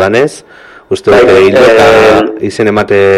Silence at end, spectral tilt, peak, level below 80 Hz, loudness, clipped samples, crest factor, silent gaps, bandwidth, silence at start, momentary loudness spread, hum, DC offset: 0 s; -5 dB/octave; 0 dBFS; -38 dBFS; -6 LUFS; under 0.1%; 6 dB; none; 14.5 kHz; 0 s; 10 LU; none; under 0.1%